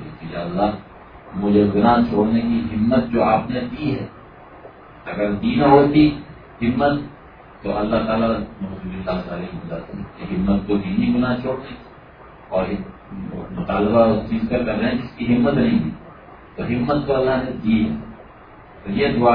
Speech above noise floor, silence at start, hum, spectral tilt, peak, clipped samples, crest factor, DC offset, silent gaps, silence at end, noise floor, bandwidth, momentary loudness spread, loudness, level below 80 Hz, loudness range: 24 dB; 0 s; none; -10.5 dB/octave; 0 dBFS; under 0.1%; 20 dB; under 0.1%; none; 0 s; -43 dBFS; 5.2 kHz; 17 LU; -20 LUFS; -40 dBFS; 5 LU